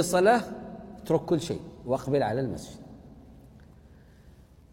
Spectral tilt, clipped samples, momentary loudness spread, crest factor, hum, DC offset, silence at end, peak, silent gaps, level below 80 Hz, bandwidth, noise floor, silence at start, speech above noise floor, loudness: -5.5 dB/octave; under 0.1%; 22 LU; 20 dB; none; under 0.1%; 0.4 s; -8 dBFS; none; -54 dBFS; 16.5 kHz; -54 dBFS; 0 s; 27 dB; -28 LUFS